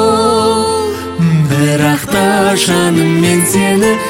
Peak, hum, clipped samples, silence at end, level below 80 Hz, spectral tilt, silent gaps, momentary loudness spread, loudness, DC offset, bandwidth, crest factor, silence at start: 0 dBFS; none; under 0.1%; 0 s; -42 dBFS; -5 dB/octave; none; 3 LU; -11 LUFS; under 0.1%; 16.5 kHz; 10 dB; 0 s